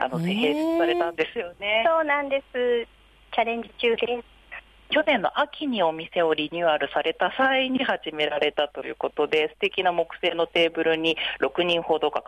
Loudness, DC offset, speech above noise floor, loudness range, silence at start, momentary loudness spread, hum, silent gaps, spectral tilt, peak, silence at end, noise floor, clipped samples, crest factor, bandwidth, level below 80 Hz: -24 LUFS; under 0.1%; 20 dB; 2 LU; 0 s; 7 LU; none; none; -5.5 dB/octave; -10 dBFS; 0.05 s; -45 dBFS; under 0.1%; 14 dB; 12.5 kHz; -60 dBFS